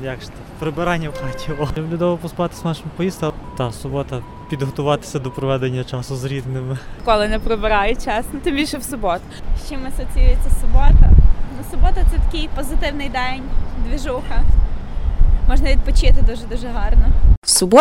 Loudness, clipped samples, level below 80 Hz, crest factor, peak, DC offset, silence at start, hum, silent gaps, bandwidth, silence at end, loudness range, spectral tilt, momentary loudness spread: -20 LUFS; under 0.1%; -16 dBFS; 14 dB; 0 dBFS; under 0.1%; 0 s; none; 17.37-17.42 s; 13 kHz; 0 s; 5 LU; -5 dB/octave; 11 LU